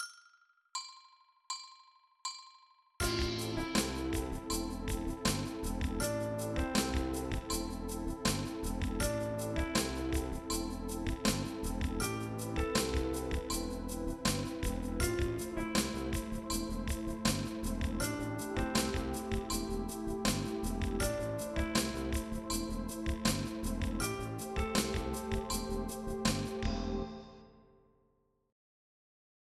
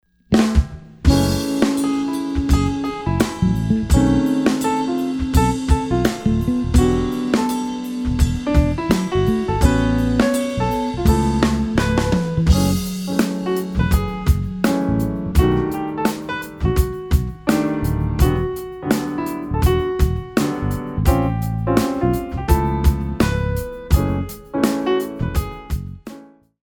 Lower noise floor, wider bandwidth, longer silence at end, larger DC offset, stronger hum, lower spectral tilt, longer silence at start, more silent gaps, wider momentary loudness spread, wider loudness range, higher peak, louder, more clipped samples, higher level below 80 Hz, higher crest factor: first, -75 dBFS vs -42 dBFS; second, 15 kHz vs over 20 kHz; first, 1.9 s vs 0.4 s; neither; neither; second, -4.5 dB/octave vs -6.5 dB/octave; second, 0 s vs 0.3 s; neither; about the same, 6 LU vs 7 LU; about the same, 2 LU vs 2 LU; second, -16 dBFS vs 0 dBFS; second, -36 LUFS vs -19 LUFS; neither; second, -44 dBFS vs -24 dBFS; about the same, 20 dB vs 18 dB